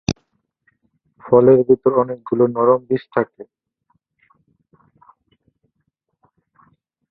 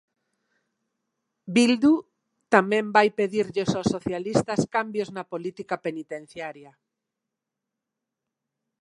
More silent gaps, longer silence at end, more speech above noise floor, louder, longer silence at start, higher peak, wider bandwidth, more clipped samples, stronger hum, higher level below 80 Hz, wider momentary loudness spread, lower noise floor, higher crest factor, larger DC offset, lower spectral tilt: neither; first, 3.65 s vs 2.15 s; second, 57 dB vs 62 dB; first, -16 LUFS vs -24 LUFS; second, 0.1 s vs 1.45 s; about the same, -2 dBFS vs -2 dBFS; second, 6.6 kHz vs 11.5 kHz; neither; neither; first, -52 dBFS vs -62 dBFS; about the same, 13 LU vs 15 LU; second, -72 dBFS vs -86 dBFS; second, 18 dB vs 24 dB; neither; first, -7.5 dB/octave vs -5.5 dB/octave